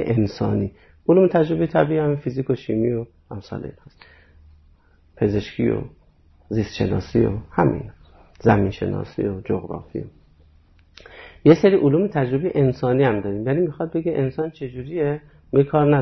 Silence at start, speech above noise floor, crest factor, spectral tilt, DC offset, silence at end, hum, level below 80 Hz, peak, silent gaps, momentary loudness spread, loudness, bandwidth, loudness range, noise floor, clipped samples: 0 s; 34 dB; 18 dB; -9 dB/octave; under 0.1%; 0 s; none; -46 dBFS; -2 dBFS; none; 16 LU; -21 LUFS; 6.2 kHz; 8 LU; -54 dBFS; under 0.1%